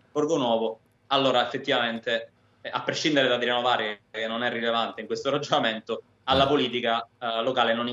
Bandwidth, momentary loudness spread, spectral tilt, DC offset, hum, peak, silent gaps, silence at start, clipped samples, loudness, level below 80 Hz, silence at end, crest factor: 7.8 kHz; 10 LU; -4 dB/octave; under 0.1%; none; -8 dBFS; none; 0.15 s; under 0.1%; -25 LUFS; -62 dBFS; 0 s; 18 dB